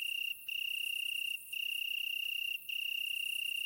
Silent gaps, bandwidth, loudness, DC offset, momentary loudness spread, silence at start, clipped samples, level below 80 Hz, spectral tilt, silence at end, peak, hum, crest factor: none; 16.5 kHz; -35 LUFS; under 0.1%; 2 LU; 0 s; under 0.1%; -84 dBFS; 4 dB/octave; 0 s; -28 dBFS; none; 10 dB